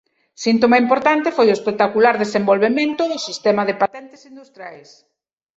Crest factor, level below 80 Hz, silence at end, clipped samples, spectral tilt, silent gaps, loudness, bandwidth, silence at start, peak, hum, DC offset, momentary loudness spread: 16 dB; -64 dBFS; 0.8 s; under 0.1%; -5 dB/octave; none; -17 LUFS; 8 kHz; 0.4 s; -2 dBFS; none; under 0.1%; 20 LU